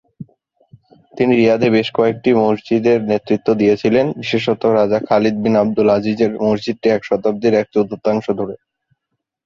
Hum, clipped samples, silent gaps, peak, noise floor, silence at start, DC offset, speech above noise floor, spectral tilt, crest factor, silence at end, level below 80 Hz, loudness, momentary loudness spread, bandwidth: none; under 0.1%; none; -2 dBFS; -76 dBFS; 0.2 s; under 0.1%; 61 dB; -7 dB/octave; 14 dB; 0.9 s; -54 dBFS; -16 LUFS; 5 LU; 7.2 kHz